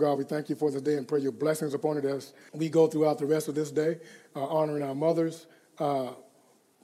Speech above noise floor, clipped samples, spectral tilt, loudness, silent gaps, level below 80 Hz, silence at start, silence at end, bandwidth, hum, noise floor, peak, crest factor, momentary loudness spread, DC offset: 35 dB; under 0.1%; -6.5 dB/octave; -29 LUFS; none; under -90 dBFS; 0 s; 0.6 s; 15 kHz; none; -63 dBFS; -12 dBFS; 18 dB; 12 LU; under 0.1%